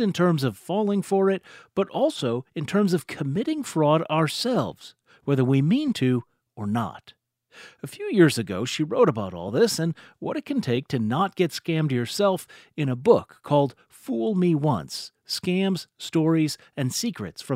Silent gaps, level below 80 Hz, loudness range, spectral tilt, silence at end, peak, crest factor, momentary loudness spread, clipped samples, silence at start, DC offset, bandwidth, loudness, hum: none; -66 dBFS; 2 LU; -6 dB/octave; 0 s; -4 dBFS; 20 dB; 11 LU; under 0.1%; 0 s; under 0.1%; 16 kHz; -24 LUFS; none